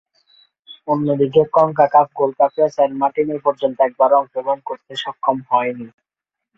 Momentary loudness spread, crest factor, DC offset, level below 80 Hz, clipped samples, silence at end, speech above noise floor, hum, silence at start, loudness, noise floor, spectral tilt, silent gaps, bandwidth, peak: 12 LU; 16 dB; under 0.1%; -64 dBFS; under 0.1%; 0.7 s; 63 dB; none; 0.7 s; -17 LUFS; -80 dBFS; -7 dB/octave; none; 7.8 kHz; -2 dBFS